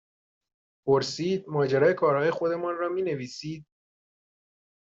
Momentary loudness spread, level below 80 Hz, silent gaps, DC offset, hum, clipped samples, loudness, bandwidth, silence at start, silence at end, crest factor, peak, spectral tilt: 14 LU; -70 dBFS; none; under 0.1%; none; under 0.1%; -26 LUFS; 7.8 kHz; 0.85 s; 1.3 s; 18 dB; -10 dBFS; -6 dB/octave